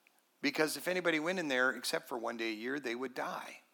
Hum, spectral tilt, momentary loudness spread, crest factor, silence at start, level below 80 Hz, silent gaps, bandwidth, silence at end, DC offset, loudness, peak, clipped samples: none; -3 dB/octave; 8 LU; 20 dB; 0.4 s; under -90 dBFS; none; 18 kHz; 0.15 s; under 0.1%; -35 LUFS; -18 dBFS; under 0.1%